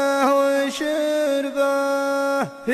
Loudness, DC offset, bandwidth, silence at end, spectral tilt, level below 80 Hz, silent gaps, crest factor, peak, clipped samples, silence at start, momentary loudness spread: -21 LUFS; under 0.1%; 14.5 kHz; 0 s; -3.5 dB/octave; -66 dBFS; none; 14 dB; -8 dBFS; under 0.1%; 0 s; 5 LU